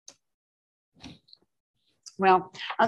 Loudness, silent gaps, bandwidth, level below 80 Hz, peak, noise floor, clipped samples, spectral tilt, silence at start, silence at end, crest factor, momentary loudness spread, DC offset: -25 LUFS; 1.60-1.74 s; 10 kHz; -70 dBFS; -8 dBFS; -56 dBFS; under 0.1%; -5 dB/octave; 1.05 s; 0 s; 22 dB; 26 LU; under 0.1%